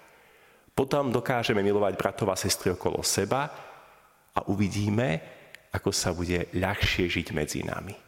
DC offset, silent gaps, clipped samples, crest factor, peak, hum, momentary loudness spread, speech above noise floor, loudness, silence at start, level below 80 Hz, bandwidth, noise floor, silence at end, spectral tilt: under 0.1%; none; under 0.1%; 22 dB; -6 dBFS; none; 9 LU; 31 dB; -28 LUFS; 0.75 s; -48 dBFS; 16.5 kHz; -58 dBFS; 0.1 s; -4.5 dB/octave